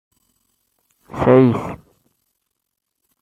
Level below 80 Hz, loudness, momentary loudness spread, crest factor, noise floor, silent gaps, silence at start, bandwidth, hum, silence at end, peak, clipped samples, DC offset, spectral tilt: -50 dBFS; -15 LUFS; 23 LU; 18 dB; -77 dBFS; none; 1.15 s; 8.6 kHz; none; 1.45 s; -2 dBFS; under 0.1%; under 0.1%; -9 dB/octave